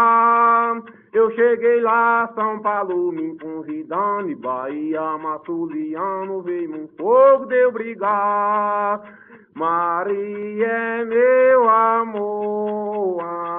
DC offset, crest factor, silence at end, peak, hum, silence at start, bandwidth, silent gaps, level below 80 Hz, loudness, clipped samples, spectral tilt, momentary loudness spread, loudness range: under 0.1%; 16 dB; 0 s; -4 dBFS; none; 0 s; 3.8 kHz; none; -70 dBFS; -19 LUFS; under 0.1%; -10 dB/octave; 12 LU; 7 LU